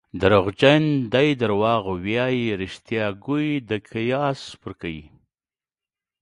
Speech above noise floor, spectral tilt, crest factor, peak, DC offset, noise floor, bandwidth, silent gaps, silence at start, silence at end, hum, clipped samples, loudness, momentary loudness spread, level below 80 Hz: over 69 dB; -7 dB/octave; 20 dB; -2 dBFS; under 0.1%; under -90 dBFS; 11 kHz; none; 0.15 s; 1.2 s; none; under 0.1%; -21 LUFS; 16 LU; -50 dBFS